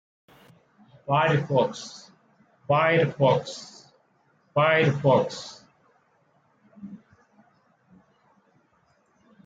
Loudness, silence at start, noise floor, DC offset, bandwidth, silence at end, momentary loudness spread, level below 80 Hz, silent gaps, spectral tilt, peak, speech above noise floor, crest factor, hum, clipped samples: -23 LUFS; 1.1 s; -65 dBFS; under 0.1%; 7.8 kHz; 2.5 s; 24 LU; -68 dBFS; none; -6 dB/octave; -8 dBFS; 43 dB; 20 dB; none; under 0.1%